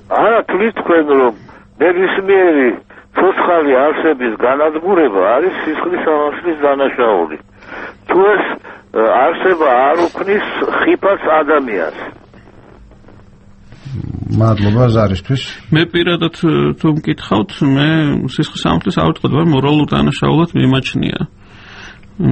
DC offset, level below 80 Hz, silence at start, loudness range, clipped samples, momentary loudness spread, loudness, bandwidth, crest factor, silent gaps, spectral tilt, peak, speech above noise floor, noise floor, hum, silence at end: under 0.1%; -40 dBFS; 0.1 s; 4 LU; under 0.1%; 11 LU; -13 LUFS; 8.6 kHz; 14 dB; none; -7.5 dB/octave; 0 dBFS; 28 dB; -40 dBFS; none; 0 s